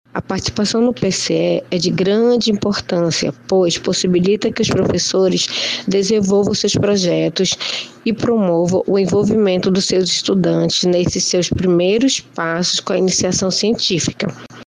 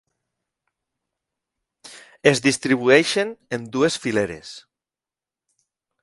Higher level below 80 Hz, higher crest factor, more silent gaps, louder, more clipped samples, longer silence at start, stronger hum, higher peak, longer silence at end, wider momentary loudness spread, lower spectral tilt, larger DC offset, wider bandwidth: first, -46 dBFS vs -62 dBFS; second, 12 dB vs 24 dB; neither; first, -16 LUFS vs -20 LUFS; neither; second, 0.15 s vs 1.85 s; neither; second, -4 dBFS vs 0 dBFS; second, 0.05 s vs 1.45 s; second, 4 LU vs 14 LU; about the same, -4.5 dB/octave vs -4 dB/octave; neither; about the same, 10.5 kHz vs 11.5 kHz